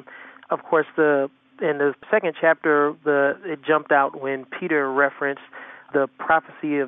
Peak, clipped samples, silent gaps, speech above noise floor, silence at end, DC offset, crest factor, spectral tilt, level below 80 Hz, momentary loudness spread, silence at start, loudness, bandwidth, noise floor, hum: -4 dBFS; under 0.1%; none; 22 dB; 0 s; under 0.1%; 18 dB; -3.5 dB/octave; -70 dBFS; 10 LU; 0.1 s; -22 LUFS; 3.8 kHz; -44 dBFS; none